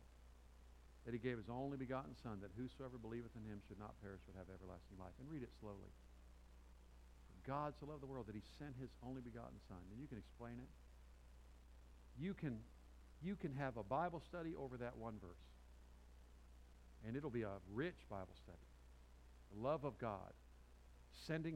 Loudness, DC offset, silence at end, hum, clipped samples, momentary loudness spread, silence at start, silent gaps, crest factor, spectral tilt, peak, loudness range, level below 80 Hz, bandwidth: -51 LUFS; under 0.1%; 0 s; none; under 0.1%; 20 LU; 0 s; none; 22 dB; -7.5 dB/octave; -30 dBFS; 8 LU; -64 dBFS; 15.5 kHz